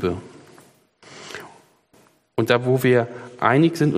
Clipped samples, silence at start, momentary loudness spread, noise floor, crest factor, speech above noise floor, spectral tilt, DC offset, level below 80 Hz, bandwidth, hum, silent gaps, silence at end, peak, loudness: under 0.1%; 0 s; 19 LU; -57 dBFS; 22 dB; 39 dB; -6.5 dB/octave; under 0.1%; -60 dBFS; 15.5 kHz; none; none; 0 s; -2 dBFS; -20 LUFS